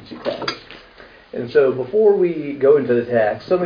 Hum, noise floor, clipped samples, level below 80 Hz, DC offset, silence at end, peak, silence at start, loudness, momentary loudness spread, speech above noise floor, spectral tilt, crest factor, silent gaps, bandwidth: none; -44 dBFS; under 0.1%; -56 dBFS; under 0.1%; 0 s; -2 dBFS; 0 s; -18 LUFS; 13 LU; 28 dB; -7 dB/octave; 16 dB; none; 5.2 kHz